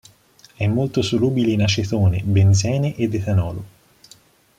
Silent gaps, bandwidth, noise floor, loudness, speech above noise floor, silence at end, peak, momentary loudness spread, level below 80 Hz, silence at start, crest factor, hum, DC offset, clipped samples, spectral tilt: none; 9.4 kHz; -51 dBFS; -19 LUFS; 34 dB; 0.9 s; -6 dBFS; 7 LU; -48 dBFS; 0.6 s; 14 dB; none; under 0.1%; under 0.1%; -6 dB/octave